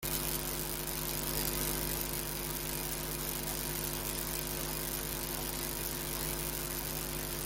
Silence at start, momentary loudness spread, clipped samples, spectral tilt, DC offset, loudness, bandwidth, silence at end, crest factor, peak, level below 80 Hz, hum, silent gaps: 0 s; 3 LU; under 0.1%; -3 dB/octave; under 0.1%; -35 LUFS; 17 kHz; 0 s; 26 dB; -12 dBFS; -46 dBFS; none; none